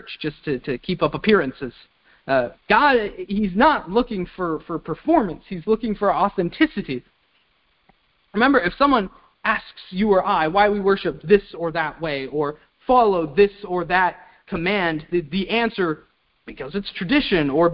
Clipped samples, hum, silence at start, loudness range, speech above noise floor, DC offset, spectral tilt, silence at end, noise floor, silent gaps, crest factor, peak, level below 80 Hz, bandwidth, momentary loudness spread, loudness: under 0.1%; none; 0.05 s; 3 LU; 43 dB; under 0.1%; -10.5 dB/octave; 0 s; -64 dBFS; none; 20 dB; -2 dBFS; -48 dBFS; 5.6 kHz; 12 LU; -21 LUFS